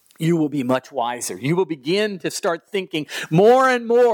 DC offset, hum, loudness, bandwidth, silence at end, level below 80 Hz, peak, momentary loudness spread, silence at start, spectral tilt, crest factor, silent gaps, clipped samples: under 0.1%; none; -20 LUFS; 19 kHz; 0 s; -70 dBFS; -4 dBFS; 11 LU; 0.2 s; -5 dB/octave; 14 dB; none; under 0.1%